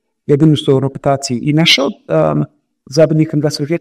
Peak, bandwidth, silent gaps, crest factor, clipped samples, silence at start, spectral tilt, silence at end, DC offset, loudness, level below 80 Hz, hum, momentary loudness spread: 0 dBFS; 14 kHz; none; 14 dB; under 0.1%; 0.3 s; -5.5 dB/octave; 0 s; under 0.1%; -13 LUFS; -50 dBFS; none; 7 LU